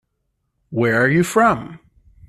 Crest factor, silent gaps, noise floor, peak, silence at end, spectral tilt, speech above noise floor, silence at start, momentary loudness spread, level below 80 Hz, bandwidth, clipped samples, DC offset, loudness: 18 dB; none; -72 dBFS; -2 dBFS; 0.5 s; -6 dB/octave; 56 dB; 0.7 s; 13 LU; -52 dBFS; 13.5 kHz; under 0.1%; under 0.1%; -17 LUFS